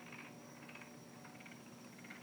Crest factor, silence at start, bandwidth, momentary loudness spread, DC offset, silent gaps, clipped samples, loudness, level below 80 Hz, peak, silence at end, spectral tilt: 18 dB; 0 s; over 20 kHz; 3 LU; under 0.1%; none; under 0.1%; -54 LUFS; -88 dBFS; -36 dBFS; 0 s; -4 dB/octave